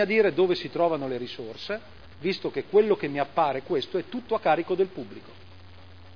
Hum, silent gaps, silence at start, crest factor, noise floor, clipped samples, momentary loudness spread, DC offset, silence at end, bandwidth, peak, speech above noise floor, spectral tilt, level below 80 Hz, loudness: none; none; 0 s; 18 dB; -49 dBFS; under 0.1%; 13 LU; 0.4%; 0 s; 5.4 kHz; -8 dBFS; 23 dB; -7 dB/octave; -62 dBFS; -26 LUFS